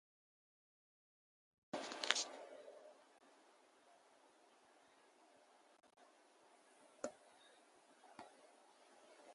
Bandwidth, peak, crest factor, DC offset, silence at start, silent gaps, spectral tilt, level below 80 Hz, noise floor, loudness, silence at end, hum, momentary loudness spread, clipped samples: 11.5 kHz; -10 dBFS; 44 dB; under 0.1%; 1.75 s; none; 0 dB/octave; under -90 dBFS; -71 dBFS; -45 LUFS; 0 s; none; 28 LU; under 0.1%